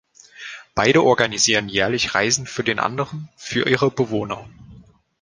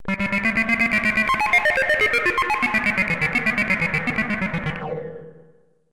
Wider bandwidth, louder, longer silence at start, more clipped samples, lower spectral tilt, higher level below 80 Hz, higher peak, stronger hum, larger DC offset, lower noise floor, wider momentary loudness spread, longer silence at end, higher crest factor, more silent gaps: second, 10.5 kHz vs 16.5 kHz; about the same, -19 LUFS vs -19 LUFS; first, 0.4 s vs 0 s; neither; second, -3 dB/octave vs -5 dB/octave; second, -52 dBFS vs -44 dBFS; first, 0 dBFS vs -6 dBFS; neither; neither; second, -47 dBFS vs -55 dBFS; first, 16 LU vs 10 LU; about the same, 0.5 s vs 0.55 s; first, 20 dB vs 14 dB; neither